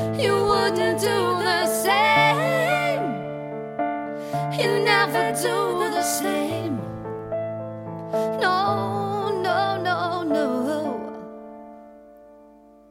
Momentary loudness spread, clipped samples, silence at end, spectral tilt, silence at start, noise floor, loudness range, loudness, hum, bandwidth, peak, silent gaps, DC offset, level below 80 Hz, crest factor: 14 LU; under 0.1%; 0.55 s; -4 dB/octave; 0 s; -50 dBFS; 5 LU; -23 LUFS; none; 16.5 kHz; -6 dBFS; none; under 0.1%; -58 dBFS; 18 dB